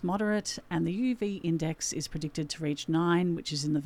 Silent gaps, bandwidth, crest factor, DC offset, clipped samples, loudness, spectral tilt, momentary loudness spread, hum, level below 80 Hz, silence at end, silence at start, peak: none; 15 kHz; 16 dB; under 0.1%; under 0.1%; -31 LUFS; -5 dB/octave; 7 LU; none; -56 dBFS; 0 s; 0 s; -14 dBFS